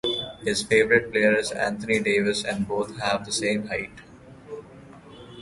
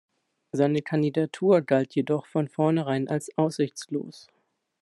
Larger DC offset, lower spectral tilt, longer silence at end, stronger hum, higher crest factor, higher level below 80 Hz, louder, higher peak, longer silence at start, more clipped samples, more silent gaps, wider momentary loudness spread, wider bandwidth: neither; second, -3.5 dB/octave vs -7 dB/octave; second, 0 s vs 0.6 s; neither; about the same, 20 dB vs 18 dB; first, -56 dBFS vs -72 dBFS; about the same, -24 LUFS vs -26 LUFS; first, -4 dBFS vs -8 dBFS; second, 0.05 s vs 0.55 s; neither; neither; first, 20 LU vs 11 LU; about the same, 11.5 kHz vs 12 kHz